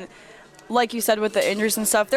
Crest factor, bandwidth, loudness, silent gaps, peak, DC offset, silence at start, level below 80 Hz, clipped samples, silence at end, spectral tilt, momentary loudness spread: 14 dB; 18 kHz; -21 LUFS; none; -8 dBFS; under 0.1%; 0 s; -62 dBFS; under 0.1%; 0 s; -2.5 dB/octave; 4 LU